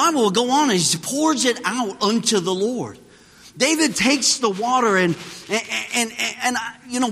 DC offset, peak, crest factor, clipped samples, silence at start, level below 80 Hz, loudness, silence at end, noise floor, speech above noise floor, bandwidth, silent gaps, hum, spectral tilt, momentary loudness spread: under 0.1%; -4 dBFS; 16 dB; under 0.1%; 0 s; -62 dBFS; -19 LUFS; 0 s; -47 dBFS; 27 dB; 15.5 kHz; none; none; -2.5 dB/octave; 8 LU